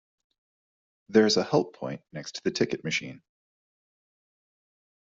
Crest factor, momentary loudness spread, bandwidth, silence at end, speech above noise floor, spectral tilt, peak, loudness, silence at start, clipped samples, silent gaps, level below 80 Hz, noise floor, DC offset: 24 dB; 16 LU; 7.8 kHz; 1.9 s; over 63 dB; -4 dB/octave; -8 dBFS; -26 LUFS; 1.1 s; under 0.1%; none; -70 dBFS; under -90 dBFS; under 0.1%